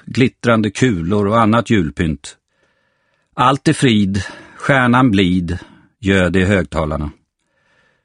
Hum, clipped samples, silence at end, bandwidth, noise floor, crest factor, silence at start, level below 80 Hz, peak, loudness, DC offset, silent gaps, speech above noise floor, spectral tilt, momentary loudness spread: none; under 0.1%; 0.9 s; 11 kHz; -63 dBFS; 16 dB; 0.05 s; -38 dBFS; 0 dBFS; -15 LUFS; under 0.1%; none; 49 dB; -6 dB/octave; 13 LU